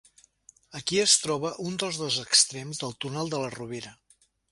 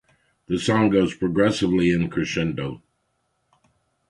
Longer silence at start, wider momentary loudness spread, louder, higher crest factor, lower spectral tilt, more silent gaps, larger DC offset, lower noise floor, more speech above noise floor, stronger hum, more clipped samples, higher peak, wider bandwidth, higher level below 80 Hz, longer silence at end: first, 0.7 s vs 0.5 s; first, 17 LU vs 11 LU; second, -25 LUFS vs -22 LUFS; about the same, 22 dB vs 18 dB; second, -2 dB/octave vs -6 dB/octave; neither; neither; second, -59 dBFS vs -72 dBFS; second, 31 dB vs 51 dB; neither; neither; about the same, -6 dBFS vs -6 dBFS; about the same, 11.5 kHz vs 11.5 kHz; second, -66 dBFS vs -48 dBFS; second, 0.6 s vs 1.3 s